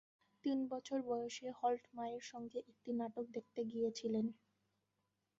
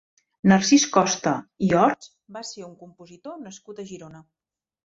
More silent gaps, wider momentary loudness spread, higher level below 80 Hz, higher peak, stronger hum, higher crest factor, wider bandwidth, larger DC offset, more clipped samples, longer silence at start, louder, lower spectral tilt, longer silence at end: neither; second, 8 LU vs 23 LU; second, -84 dBFS vs -60 dBFS; second, -26 dBFS vs -4 dBFS; neither; about the same, 18 dB vs 20 dB; about the same, 7.6 kHz vs 7.8 kHz; neither; neither; about the same, 0.45 s vs 0.45 s; second, -43 LUFS vs -20 LUFS; about the same, -5 dB/octave vs -4.5 dB/octave; first, 1.05 s vs 0.7 s